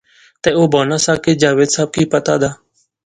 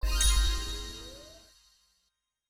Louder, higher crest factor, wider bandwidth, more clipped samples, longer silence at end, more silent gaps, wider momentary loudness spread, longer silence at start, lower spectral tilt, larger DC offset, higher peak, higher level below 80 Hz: first, -14 LUFS vs -30 LUFS; about the same, 16 dB vs 18 dB; second, 11.5 kHz vs 19 kHz; neither; second, 0.5 s vs 1.15 s; neither; second, 5 LU vs 23 LU; first, 0.45 s vs 0 s; first, -4.5 dB/octave vs -2 dB/octave; neither; first, 0 dBFS vs -14 dBFS; second, -48 dBFS vs -32 dBFS